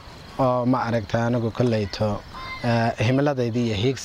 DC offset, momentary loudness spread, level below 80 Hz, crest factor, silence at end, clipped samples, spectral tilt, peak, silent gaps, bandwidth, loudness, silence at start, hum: under 0.1%; 6 LU; -48 dBFS; 16 dB; 0 s; under 0.1%; -7 dB/octave; -8 dBFS; none; 10.5 kHz; -23 LUFS; 0 s; none